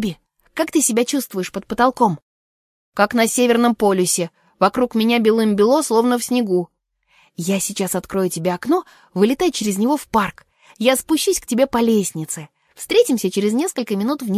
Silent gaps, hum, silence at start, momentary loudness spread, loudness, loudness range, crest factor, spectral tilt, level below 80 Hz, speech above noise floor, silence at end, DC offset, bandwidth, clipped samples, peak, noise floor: 2.22-2.92 s; none; 0 s; 11 LU; -18 LUFS; 4 LU; 16 dB; -4 dB/octave; -54 dBFS; 41 dB; 0 s; under 0.1%; 15.5 kHz; under 0.1%; -2 dBFS; -59 dBFS